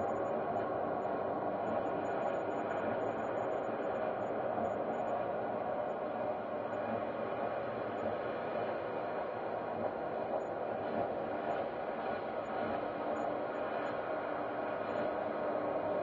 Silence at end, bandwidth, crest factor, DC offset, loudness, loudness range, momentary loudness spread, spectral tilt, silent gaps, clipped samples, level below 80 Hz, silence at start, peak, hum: 0 s; 7 kHz; 14 dB; under 0.1%; -37 LUFS; 2 LU; 3 LU; -5 dB/octave; none; under 0.1%; -70 dBFS; 0 s; -24 dBFS; none